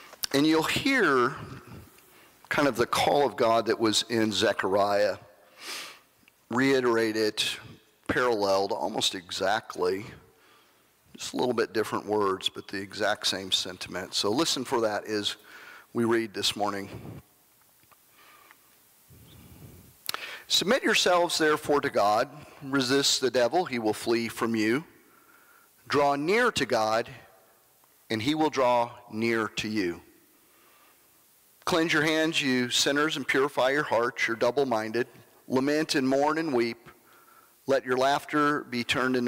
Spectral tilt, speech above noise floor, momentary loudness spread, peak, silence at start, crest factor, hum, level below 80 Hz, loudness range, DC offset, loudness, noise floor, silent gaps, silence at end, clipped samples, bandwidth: -3.5 dB/octave; 36 dB; 13 LU; -10 dBFS; 0 s; 18 dB; none; -64 dBFS; 6 LU; under 0.1%; -26 LUFS; -62 dBFS; none; 0 s; under 0.1%; 16 kHz